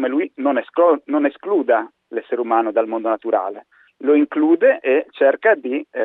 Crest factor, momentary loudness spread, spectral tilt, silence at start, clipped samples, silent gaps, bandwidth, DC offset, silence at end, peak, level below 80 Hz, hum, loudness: 14 dB; 10 LU; -8 dB/octave; 0 s; under 0.1%; none; 4 kHz; under 0.1%; 0 s; -4 dBFS; -76 dBFS; none; -18 LUFS